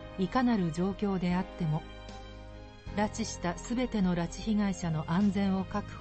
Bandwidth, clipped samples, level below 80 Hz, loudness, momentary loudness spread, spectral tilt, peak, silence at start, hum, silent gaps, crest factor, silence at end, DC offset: 8.8 kHz; under 0.1%; -48 dBFS; -31 LUFS; 18 LU; -6.5 dB/octave; -16 dBFS; 0 s; none; none; 16 dB; 0 s; under 0.1%